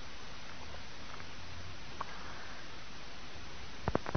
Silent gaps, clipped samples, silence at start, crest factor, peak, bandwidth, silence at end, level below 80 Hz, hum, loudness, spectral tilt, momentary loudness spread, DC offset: none; under 0.1%; 0 s; 32 dB; -14 dBFS; 6.4 kHz; 0 s; -56 dBFS; none; -46 LUFS; -3.5 dB/octave; 7 LU; 1%